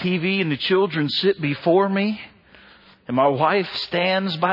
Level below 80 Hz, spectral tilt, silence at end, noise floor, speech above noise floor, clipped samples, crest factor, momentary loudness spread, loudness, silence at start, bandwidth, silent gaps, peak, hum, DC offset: -64 dBFS; -7.5 dB/octave; 0 s; -50 dBFS; 29 dB; under 0.1%; 16 dB; 5 LU; -20 LUFS; 0 s; 5.8 kHz; none; -6 dBFS; none; under 0.1%